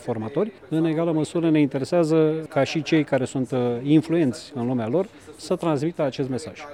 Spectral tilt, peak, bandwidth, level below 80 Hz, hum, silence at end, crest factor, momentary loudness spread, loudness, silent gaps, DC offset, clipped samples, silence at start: -7 dB/octave; -6 dBFS; 11.5 kHz; -64 dBFS; none; 0 s; 16 dB; 8 LU; -23 LUFS; none; under 0.1%; under 0.1%; 0 s